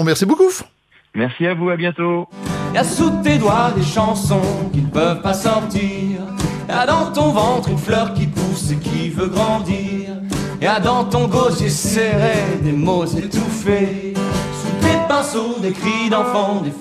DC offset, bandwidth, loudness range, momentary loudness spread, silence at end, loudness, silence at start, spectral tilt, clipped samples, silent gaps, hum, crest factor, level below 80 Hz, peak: under 0.1%; 14.5 kHz; 2 LU; 7 LU; 0 s; -18 LUFS; 0 s; -5.5 dB/octave; under 0.1%; none; none; 14 dB; -40 dBFS; -2 dBFS